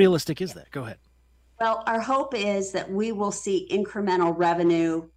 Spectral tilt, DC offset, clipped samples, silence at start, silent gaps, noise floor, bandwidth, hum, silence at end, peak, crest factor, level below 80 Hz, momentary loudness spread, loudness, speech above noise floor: -5.5 dB/octave; under 0.1%; under 0.1%; 0 s; none; -60 dBFS; 15.5 kHz; none; 0.1 s; -8 dBFS; 18 dB; -60 dBFS; 11 LU; -25 LUFS; 35 dB